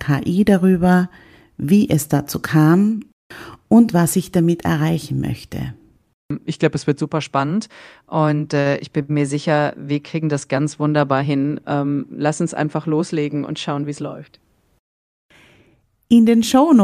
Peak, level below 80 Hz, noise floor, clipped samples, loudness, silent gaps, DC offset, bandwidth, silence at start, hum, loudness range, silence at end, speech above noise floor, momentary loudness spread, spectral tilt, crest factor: 0 dBFS; -50 dBFS; -57 dBFS; under 0.1%; -18 LUFS; 3.13-3.30 s, 6.14-6.29 s, 14.79-15.29 s; under 0.1%; 15.5 kHz; 0 s; none; 6 LU; 0 s; 40 dB; 14 LU; -6.5 dB/octave; 18 dB